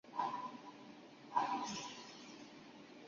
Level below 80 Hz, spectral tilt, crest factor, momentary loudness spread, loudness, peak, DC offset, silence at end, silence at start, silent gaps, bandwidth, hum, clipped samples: -86 dBFS; -2 dB/octave; 22 dB; 18 LU; -43 LUFS; -22 dBFS; under 0.1%; 0 s; 0.05 s; none; 7.2 kHz; none; under 0.1%